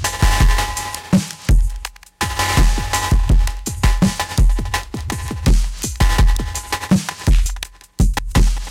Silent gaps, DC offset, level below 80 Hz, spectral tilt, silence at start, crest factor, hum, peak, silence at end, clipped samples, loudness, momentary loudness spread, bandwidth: none; under 0.1%; -18 dBFS; -4.5 dB/octave; 0 s; 12 dB; none; -4 dBFS; 0 s; under 0.1%; -19 LUFS; 9 LU; 16 kHz